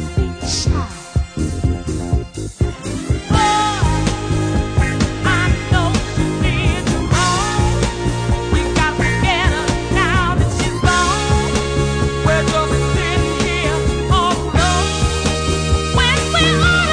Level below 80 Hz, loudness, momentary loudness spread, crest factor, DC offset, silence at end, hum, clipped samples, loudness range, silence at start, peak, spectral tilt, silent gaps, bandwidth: -22 dBFS; -17 LUFS; 7 LU; 16 dB; under 0.1%; 0 s; none; under 0.1%; 3 LU; 0 s; -2 dBFS; -4.5 dB/octave; none; 10.5 kHz